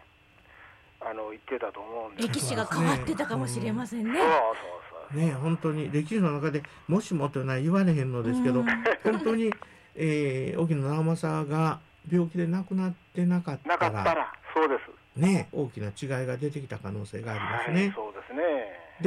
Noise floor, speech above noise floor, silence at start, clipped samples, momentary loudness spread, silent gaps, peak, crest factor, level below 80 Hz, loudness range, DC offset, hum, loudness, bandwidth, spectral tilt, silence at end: -58 dBFS; 30 dB; 0.6 s; under 0.1%; 11 LU; none; -16 dBFS; 14 dB; -62 dBFS; 4 LU; under 0.1%; none; -29 LUFS; 13 kHz; -6.5 dB/octave; 0 s